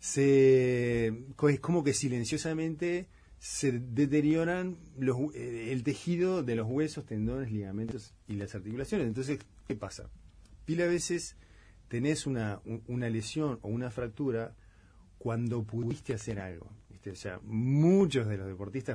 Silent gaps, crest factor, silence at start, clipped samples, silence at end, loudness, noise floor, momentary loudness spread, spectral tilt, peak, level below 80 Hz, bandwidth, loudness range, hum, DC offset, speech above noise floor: none; 16 dB; 0 s; under 0.1%; 0 s; -32 LUFS; -58 dBFS; 15 LU; -6 dB/octave; -14 dBFS; -56 dBFS; 10.5 kHz; 6 LU; none; under 0.1%; 27 dB